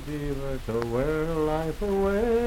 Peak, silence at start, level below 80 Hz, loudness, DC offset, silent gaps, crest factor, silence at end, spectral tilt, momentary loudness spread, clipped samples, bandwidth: -10 dBFS; 0 s; -36 dBFS; -28 LUFS; under 0.1%; none; 16 dB; 0 s; -7 dB/octave; 7 LU; under 0.1%; 16.5 kHz